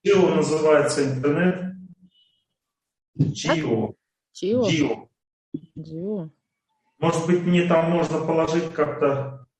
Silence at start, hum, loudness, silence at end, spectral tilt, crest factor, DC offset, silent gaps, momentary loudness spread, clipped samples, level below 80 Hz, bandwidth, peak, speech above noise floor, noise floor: 0.05 s; none; -22 LUFS; 0.15 s; -6 dB/octave; 16 dB; under 0.1%; 3.08-3.14 s, 5.33-5.52 s; 16 LU; under 0.1%; -60 dBFS; 11 kHz; -6 dBFS; 61 dB; -83 dBFS